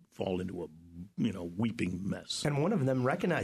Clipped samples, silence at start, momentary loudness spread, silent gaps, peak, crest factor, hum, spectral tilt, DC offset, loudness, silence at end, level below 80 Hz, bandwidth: under 0.1%; 0.2 s; 13 LU; none; -18 dBFS; 16 dB; none; -6 dB/octave; under 0.1%; -33 LUFS; 0 s; -64 dBFS; 13.5 kHz